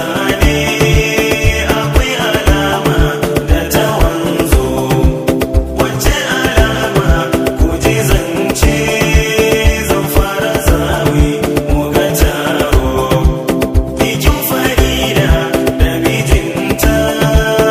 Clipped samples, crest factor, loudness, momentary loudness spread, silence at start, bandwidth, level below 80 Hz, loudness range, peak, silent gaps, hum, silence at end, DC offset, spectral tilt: 0.5%; 12 dB; -12 LUFS; 3 LU; 0 s; 16.5 kHz; -18 dBFS; 1 LU; 0 dBFS; none; none; 0 s; under 0.1%; -5 dB/octave